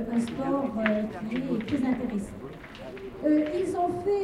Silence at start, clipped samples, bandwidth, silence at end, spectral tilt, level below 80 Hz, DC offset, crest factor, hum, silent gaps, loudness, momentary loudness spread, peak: 0 s; under 0.1%; 12.5 kHz; 0 s; -7 dB/octave; -54 dBFS; under 0.1%; 18 dB; none; none; -28 LUFS; 15 LU; -10 dBFS